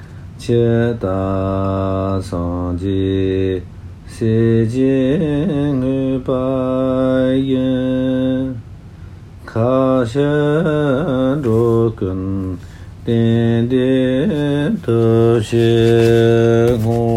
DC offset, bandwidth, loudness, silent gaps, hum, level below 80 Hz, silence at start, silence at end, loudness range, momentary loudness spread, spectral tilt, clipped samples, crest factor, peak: under 0.1%; 12.5 kHz; -16 LUFS; none; none; -38 dBFS; 0 s; 0 s; 4 LU; 9 LU; -8 dB/octave; under 0.1%; 14 dB; -2 dBFS